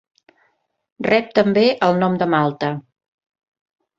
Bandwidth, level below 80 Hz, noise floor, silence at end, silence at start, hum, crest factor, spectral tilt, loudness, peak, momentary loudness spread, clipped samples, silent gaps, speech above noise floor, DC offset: 7.6 kHz; -60 dBFS; -66 dBFS; 1.2 s; 1 s; none; 18 dB; -7.5 dB/octave; -18 LUFS; -2 dBFS; 10 LU; under 0.1%; none; 49 dB; under 0.1%